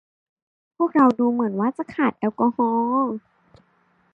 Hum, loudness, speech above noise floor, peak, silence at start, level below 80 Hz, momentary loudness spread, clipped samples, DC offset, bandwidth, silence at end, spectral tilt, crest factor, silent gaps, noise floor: none; -21 LUFS; 42 dB; -4 dBFS; 0.8 s; -68 dBFS; 8 LU; under 0.1%; under 0.1%; 5.2 kHz; 0.95 s; -8.5 dB/octave; 18 dB; none; -63 dBFS